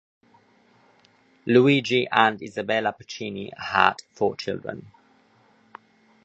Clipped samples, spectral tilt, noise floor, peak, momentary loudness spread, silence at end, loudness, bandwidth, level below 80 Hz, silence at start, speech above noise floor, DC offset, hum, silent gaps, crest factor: under 0.1%; -5.5 dB/octave; -59 dBFS; 0 dBFS; 15 LU; 1.4 s; -23 LUFS; 8.4 kHz; -64 dBFS; 1.45 s; 37 dB; under 0.1%; none; none; 24 dB